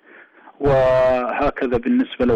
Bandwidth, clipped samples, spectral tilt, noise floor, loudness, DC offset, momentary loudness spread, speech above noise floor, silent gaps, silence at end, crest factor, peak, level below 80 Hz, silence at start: 7.6 kHz; under 0.1%; -8 dB/octave; -46 dBFS; -18 LUFS; under 0.1%; 6 LU; 29 dB; none; 0 s; 8 dB; -10 dBFS; -38 dBFS; 0.6 s